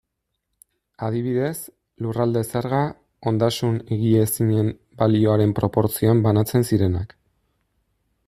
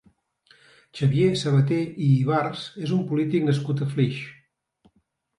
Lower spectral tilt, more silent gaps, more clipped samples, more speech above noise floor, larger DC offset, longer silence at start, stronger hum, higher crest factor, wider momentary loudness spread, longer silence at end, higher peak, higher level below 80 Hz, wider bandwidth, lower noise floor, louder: about the same, -7 dB/octave vs -7.5 dB/octave; neither; neither; first, 58 dB vs 47 dB; neither; about the same, 1 s vs 0.95 s; neither; about the same, 18 dB vs 16 dB; about the same, 10 LU vs 10 LU; first, 1.2 s vs 1.05 s; first, -4 dBFS vs -8 dBFS; first, -52 dBFS vs -62 dBFS; first, 15 kHz vs 11 kHz; first, -78 dBFS vs -69 dBFS; about the same, -21 LUFS vs -23 LUFS